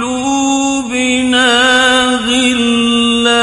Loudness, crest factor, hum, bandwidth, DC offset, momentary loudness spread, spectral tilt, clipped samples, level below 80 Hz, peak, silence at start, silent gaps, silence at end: -11 LUFS; 12 dB; none; 11.5 kHz; under 0.1%; 6 LU; -1.5 dB/octave; under 0.1%; -42 dBFS; 0 dBFS; 0 s; none; 0 s